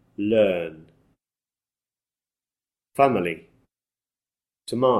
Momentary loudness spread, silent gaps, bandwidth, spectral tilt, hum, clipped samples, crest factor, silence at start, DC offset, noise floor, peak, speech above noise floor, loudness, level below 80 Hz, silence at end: 16 LU; none; 13 kHz; -6.5 dB/octave; none; under 0.1%; 20 dB; 0.2 s; under 0.1%; under -90 dBFS; -6 dBFS; over 69 dB; -23 LUFS; -64 dBFS; 0 s